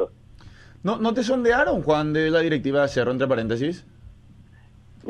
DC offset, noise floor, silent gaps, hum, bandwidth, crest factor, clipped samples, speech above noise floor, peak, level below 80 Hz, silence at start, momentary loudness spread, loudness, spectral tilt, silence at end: under 0.1%; -50 dBFS; none; none; 10 kHz; 16 dB; under 0.1%; 28 dB; -8 dBFS; -48 dBFS; 0 s; 9 LU; -22 LUFS; -6 dB/octave; 0 s